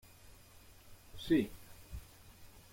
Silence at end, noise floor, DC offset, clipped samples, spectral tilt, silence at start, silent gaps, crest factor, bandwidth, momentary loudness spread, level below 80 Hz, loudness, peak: 0.15 s; -59 dBFS; under 0.1%; under 0.1%; -6 dB/octave; 0.25 s; none; 20 dB; 16.5 kHz; 26 LU; -58 dBFS; -35 LUFS; -20 dBFS